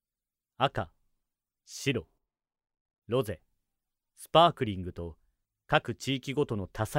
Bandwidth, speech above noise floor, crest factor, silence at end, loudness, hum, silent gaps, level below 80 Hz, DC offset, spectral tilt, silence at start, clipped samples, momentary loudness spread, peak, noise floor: 16 kHz; over 61 dB; 26 dB; 0 s; -30 LUFS; none; 2.81-2.85 s, 2.98-3.02 s; -58 dBFS; under 0.1%; -5 dB/octave; 0.6 s; under 0.1%; 20 LU; -6 dBFS; under -90 dBFS